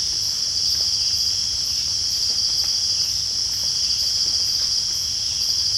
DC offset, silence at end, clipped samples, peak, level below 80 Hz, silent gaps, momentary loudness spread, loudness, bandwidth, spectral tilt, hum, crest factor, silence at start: under 0.1%; 0 s; under 0.1%; -8 dBFS; -48 dBFS; none; 2 LU; -18 LUFS; 16.5 kHz; 1 dB/octave; none; 14 dB; 0 s